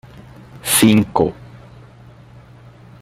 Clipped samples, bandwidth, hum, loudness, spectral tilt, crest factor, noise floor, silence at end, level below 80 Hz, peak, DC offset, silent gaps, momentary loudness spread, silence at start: under 0.1%; 16 kHz; 60 Hz at -45 dBFS; -15 LUFS; -4 dB/octave; 20 dB; -42 dBFS; 1.7 s; -48 dBFS; 0 dBFS; under 0.1%; none; 16 LU; 0.55 s